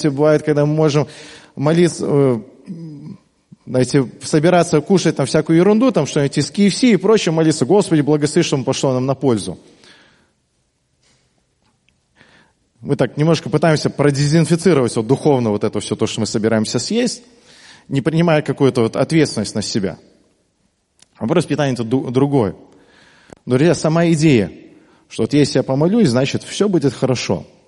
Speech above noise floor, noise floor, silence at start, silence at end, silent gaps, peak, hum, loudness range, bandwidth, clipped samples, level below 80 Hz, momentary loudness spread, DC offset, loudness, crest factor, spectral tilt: 49 dB; -65 dBFS; 0 s; 0.25 s; none; 0 dBFS; none; 6 LU; 11.5 kHz; under 0.1%; -54 dBFS; 10 LU; under 0.1%; -16 LUFS; 16 dB; -6 dB/octave